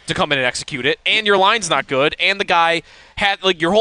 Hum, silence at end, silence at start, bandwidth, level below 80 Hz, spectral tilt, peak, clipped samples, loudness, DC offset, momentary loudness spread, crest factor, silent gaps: none; 0 s; 0.05 s; 10.5 kHz; -48 dBFS; -3 dB/octave; -2 dBFS; under 0.1%; -16 LUFS; under 0.1%; 6 LU; 14 dB; none